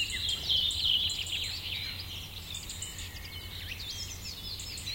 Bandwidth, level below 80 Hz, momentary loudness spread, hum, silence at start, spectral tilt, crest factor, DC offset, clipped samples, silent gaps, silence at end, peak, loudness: 17 kHz; -50 dBFS; 14 LU; none; 0 s; -1 dB/octave; 20 dB; under 0.1%; under 0.1%; none; 0 s; -16 dBFS; -32 LUFS